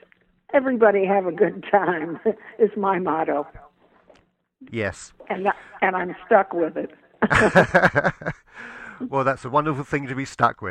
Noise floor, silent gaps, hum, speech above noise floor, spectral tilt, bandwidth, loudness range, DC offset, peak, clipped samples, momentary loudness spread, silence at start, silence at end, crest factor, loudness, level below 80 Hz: -60 dBFS; none; none; 39 dB; -6.5 dB/octave; 11 kHz; 6 LU; under 0.1%; -2 dBFS; under 0.1%; 16 LU; 0.5 s; 0 s; 20 dB; -21 LUFS; -52 dBFS